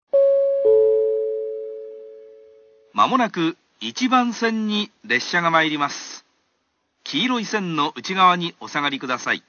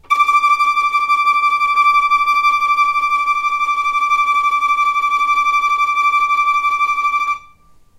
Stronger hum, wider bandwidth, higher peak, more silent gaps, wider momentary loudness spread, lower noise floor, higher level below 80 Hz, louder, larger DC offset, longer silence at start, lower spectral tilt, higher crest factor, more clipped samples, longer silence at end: neither; second, 7 kHz vs 16 kHz; about the same, -4 dBFS vs -2 dBFS; neither; first, 15 LU vs 4 LU; first, -71 dBFS vs -47 dBFS; second, -76 dBFS vs -54 dBFS; second, -20 LUFS vs -14 LUFS; neither; about the same, 0.15 s vs 0.1 s; first, -4 dB/octave vs 1 dB/octave; first, 18 dB vs 12 dB; neither; second, 0.1 s vs 0.6 s